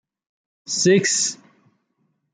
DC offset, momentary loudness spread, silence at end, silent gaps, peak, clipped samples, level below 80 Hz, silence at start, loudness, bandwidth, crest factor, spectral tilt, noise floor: under 0.1%; 12 LU; 1 s; none; -6 dBFS; under 0.1%; -70 dBFS; 0.7 s; -19 LUFS; 10 kHz; 18 dB; -3 dB/octave; -70 dBFS